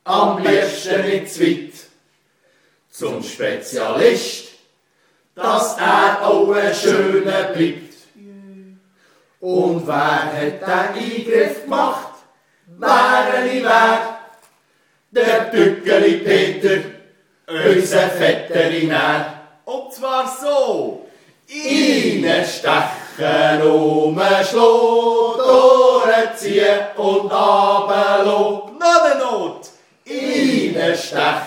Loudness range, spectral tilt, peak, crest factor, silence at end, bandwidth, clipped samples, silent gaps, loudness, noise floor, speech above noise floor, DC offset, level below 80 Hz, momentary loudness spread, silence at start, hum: 8 LU; -4 dB/octave; 0 dBFS; 16 dB; 0 s; 19 kHz; under 0.1%; none; -16 LUFS; -61 dBFS; 45 dB; under 0.1%; -70 dBFS; 13 LU; 0.05 s; none